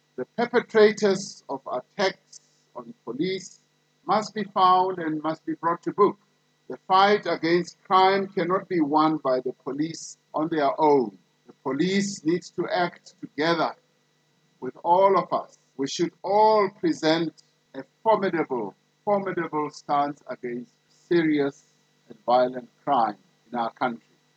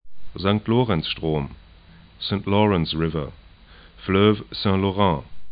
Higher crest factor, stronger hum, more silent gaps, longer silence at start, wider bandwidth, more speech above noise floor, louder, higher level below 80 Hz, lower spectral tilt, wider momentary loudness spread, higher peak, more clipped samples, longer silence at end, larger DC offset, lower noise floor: about the same, 20 dB vs 20 dB; neither; neither; first, 0.2 s vs 0.05 s; first, 8.8 kHz vs 5 kHz; first, 43 dB vs 27 dB; about the same, -24 LUFS vs -22 LUFS; second, -82 dBFS vs -44 dBFS; second, -5 dB/octave vs -11.5 dB/octave; first, 17 LU vs 12 LU; about the same, -6 dBFS vs -4 dBFS; neither; first, 0.4 s vs 0 s; neither; first, -67 dBFS vs -48 dBFS